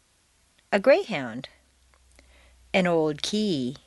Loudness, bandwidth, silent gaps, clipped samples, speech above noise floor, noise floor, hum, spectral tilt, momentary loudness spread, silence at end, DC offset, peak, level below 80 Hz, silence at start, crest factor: -24 LUFS; 11.5 kHz; none; under 0.1%; 40 dB; -65 dBFS; none; -5 dB/octave; 15 LU; 0.1 s; under 0.1%; -6 dBFS; -60 dBFS; 0.7 s; 20 dB